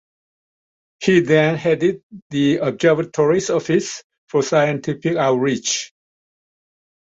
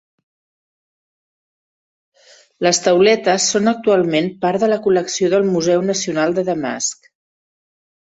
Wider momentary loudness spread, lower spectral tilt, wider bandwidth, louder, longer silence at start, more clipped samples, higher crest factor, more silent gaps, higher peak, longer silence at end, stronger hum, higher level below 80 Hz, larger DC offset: about the same, 8 LU vs 7 LU; about the same, -5 dB/octave vs -4 dB/octave; about the same, 8 kHz vs 8.4 kHz; about the same, -18 LUFS vs -16 LUFS; second, 1 s vs 2.6 s; neither; about the same, 18 dB vs 18 dB; first, 2.03-2.10 s, 2.22-2.30 s, 4.04-4.10 s, 4.18-4.27 s vs none; about the same, -2 dBFS vs -2 dBFS; about the same, 1.25 s vs 1.15 s; neither; about the same, -60 dBFS vs -62 dBFS; neither